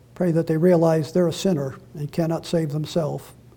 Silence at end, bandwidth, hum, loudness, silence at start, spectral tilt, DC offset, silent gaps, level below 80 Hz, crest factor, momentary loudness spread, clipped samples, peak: 0.25 s; 18 kHz; none; -22 LUFS; 0.2 s; -7 dB/octave; under 0.1%; none; -56 dBFS; 16 dB; 12 LU; under 0.1%; -6 dBFS